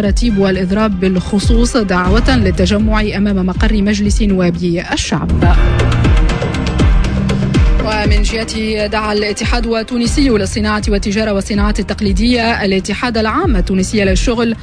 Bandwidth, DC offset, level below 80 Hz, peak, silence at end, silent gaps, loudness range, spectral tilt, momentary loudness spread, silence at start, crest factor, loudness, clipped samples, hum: 10.5 kHz; under 0.1%; -16 dBFS; 0 dBFS; 0 s; none; 2 LU; -5.5 dB/octave; 4 LU; 0 s; 12 dB; -14 LUFS; under 0.1%; none